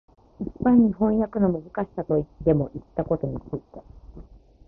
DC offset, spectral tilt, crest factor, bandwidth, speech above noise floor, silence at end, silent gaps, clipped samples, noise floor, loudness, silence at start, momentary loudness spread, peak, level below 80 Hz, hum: under 0.1%; -13 dB/octave; 18 dB; 2.9 kHz; 23 dB; 0.45 s; none; under 0.1%; -46 dBFS; -24 LUFS; 0.4 s; 17 LU; -6 dBFS; -46 dBFS; none